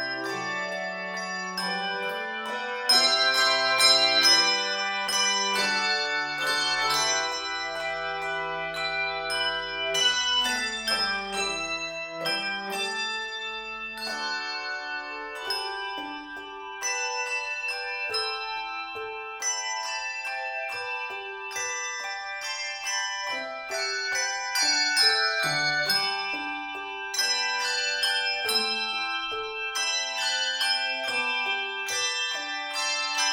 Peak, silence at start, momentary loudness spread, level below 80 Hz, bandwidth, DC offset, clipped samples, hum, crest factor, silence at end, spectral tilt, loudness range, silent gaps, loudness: -6 dBFS; 0 s; 12 LU; -62 dBFS; 18 kHz; under 0.1%; under 0.1%; none; 22 dB; 0 s; 0.5 dB/octave; 10 LU; none; -26 LUFS